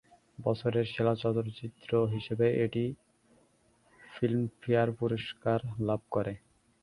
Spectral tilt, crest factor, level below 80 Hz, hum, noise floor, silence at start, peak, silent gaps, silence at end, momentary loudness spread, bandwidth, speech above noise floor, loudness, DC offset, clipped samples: -8.5 dB/octave; 18 dB; -62 dBFS; none; -67 dBFS; 0.4 s; -14 dBFS; none; 0.45 s; 9 LU; 11 kHz; 37 dB; -32 LUFS; under 0.1%; under 0.1%